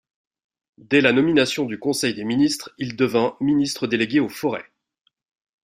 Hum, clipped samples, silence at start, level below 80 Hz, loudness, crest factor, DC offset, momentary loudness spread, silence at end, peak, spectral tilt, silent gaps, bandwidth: none; under 0.1%; 0.9 s; -60 dBFS; -21 LUFS; 20 dB; under 0.1%; 10 LU; 1 s; -2 dBFS; -4.5 dB/octave; none; 15.5 kHz